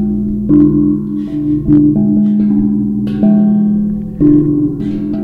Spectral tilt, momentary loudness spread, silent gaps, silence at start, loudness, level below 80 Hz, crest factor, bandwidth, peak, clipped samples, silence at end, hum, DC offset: -12 dB/octave; 8 LU; none; 0 s; -12 LUFS; -32 dBFS; 12 dB; 3.4 kHz; 0 dBFS; under 0.1%; 0 s; none; under 0.1%